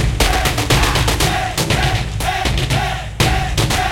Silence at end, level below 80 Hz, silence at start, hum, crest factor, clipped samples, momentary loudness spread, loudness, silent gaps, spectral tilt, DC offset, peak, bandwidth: 0 s; -22 dBFS; 0 s; none; 16 dB; under 0.1%; 4 LU; -16 LUFS; none; -4 dB/octave; under 0.1%; 0 dBFS; 17 kHz